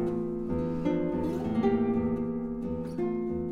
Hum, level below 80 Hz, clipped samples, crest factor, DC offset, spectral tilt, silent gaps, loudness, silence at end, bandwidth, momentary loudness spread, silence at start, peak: none; -50 dBFS; under 0.1%; 14 dB; under 0.1%; -9.5 dB/octave; none; -30 LUFS; 0 s; 6.8 kHz; 7 LU; 0 s; -14 dBFS